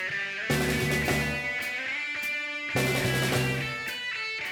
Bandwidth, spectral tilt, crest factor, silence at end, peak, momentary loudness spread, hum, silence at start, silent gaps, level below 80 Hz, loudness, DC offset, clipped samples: over 20 kHz; -4 dB/octave; 16 dB; 0 s; -14 dBFS; 5 LU; none; 0 s; none; -48 dBFS; -28 LUFS; under 0.1%; under 0.1%